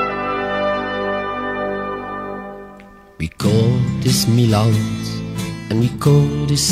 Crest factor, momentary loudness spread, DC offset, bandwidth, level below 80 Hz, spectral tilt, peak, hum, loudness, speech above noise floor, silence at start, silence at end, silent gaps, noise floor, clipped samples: 16 dB; 14 LU; under 0.1%; 16 kHz; -40 dBFS; -5.5 dB/octave; -2 dBFS; 50 Hz at -40 dBFS; -18 LUFS; 26 dB; 0 s; 0 s; none; -41 dBFS; under 0.1%